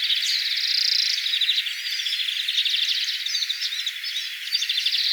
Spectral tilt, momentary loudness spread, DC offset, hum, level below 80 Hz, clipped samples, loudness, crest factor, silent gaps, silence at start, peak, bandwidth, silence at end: 14 dB/octave; 6 LU; under 0.1%; none; under -90 dBFS; under 0.1%; -21 LUFS; 16 dB; none; 0 s; -8 dBFS; over 20 kHz; 0 s